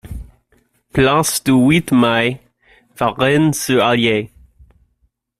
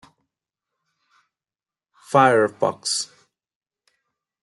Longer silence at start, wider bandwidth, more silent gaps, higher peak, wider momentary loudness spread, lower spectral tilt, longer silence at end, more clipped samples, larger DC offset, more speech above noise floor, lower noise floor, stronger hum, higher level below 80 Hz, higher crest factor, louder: second, 0.05 s vs 2.1 s; first, 15 kHz vs 12 kHz; neither; about the same, -2 dBFS vs -2 dBFS; first, 15 LU vs 9 LU; about the same, -4.5 dB/octave vs -3.5 dB/octave; second, 1.1 s vs 1.4 s; neither; neither; second, 49 dB vs over 71 dB; second, -64 dBFS vs under -90 dBFS; neither; first, -42 dBFS vs -74 dBFS; second, 16 dB vs 22 dB; first, -15 LUFS vs -19 LUFS